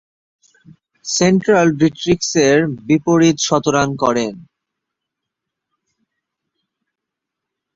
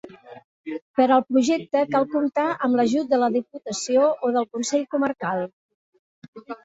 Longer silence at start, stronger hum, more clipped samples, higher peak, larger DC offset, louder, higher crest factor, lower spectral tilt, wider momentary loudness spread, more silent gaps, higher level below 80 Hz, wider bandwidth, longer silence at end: first, 1.05 s vs 0.05 s; neither; neither; first, -2 dBFS vs -6 dBFS; neither; first, -15 LUFS vs -22 LUFS; about the same, 16 dB vs 18 dB; about the same, -4.5 dB/octave vs -4.5 dB/octave; second, 7 LU vs 15 LU; second, none vs 0.44-0.64 s, 0.82-0.94 s, 5.53-5.93 s, 5.99-6.22 s, 6.28-6.33 s; first, -52 dBFS vs -68 dBFS; about the same, 7.8 kHz vs 8 kHz; first, 3.35 s vs 0.1 s